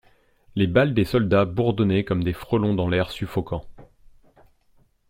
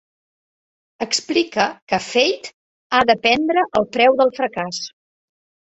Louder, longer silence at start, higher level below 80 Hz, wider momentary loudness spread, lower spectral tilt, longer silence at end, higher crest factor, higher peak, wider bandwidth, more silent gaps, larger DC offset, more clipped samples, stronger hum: second, -23 LUFS vs -18 LUFS; second, 0.55 s vs 1 s; first, -46 dBFS vs -58 dBFS; second, 9 LU vs 14 LU; first, -8 dB/octave vs -3 dB/octave; first, 1.25 s vs 0.8 s; about the same, 20 dB vs 20 dB; second, -4 dBFS vs 0 dBFS; first, 16 kHz vs 8.2 kHz; second, none vs 1.82-1.87 s, 2.53-2.90 s; neither; neither; neither